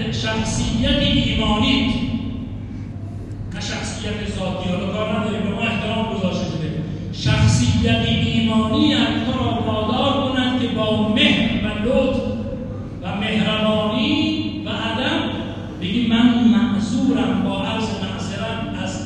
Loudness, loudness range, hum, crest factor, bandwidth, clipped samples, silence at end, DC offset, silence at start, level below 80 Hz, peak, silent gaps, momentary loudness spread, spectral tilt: -20 LUFS; 5 LU; none; 16 dB; 11 kHz; under 0.1%; 0 s; under 0.1%; 0 s; -36 dBFS; -2 dBFS; none; 11 LU; -5.5 dB/octave